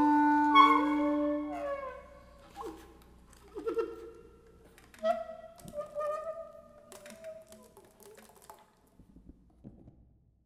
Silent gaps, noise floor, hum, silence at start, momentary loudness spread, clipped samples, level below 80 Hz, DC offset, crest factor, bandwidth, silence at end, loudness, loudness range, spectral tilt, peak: none; -63 dBFS; none; 0 s; 27 LU; under 0.1%; -62 dBFS; under 0.1%; 24 dB; 14 kHz; 0.75 s; -29 LUFS; 24 LU; -4.5 dB/octave; -8 dBFS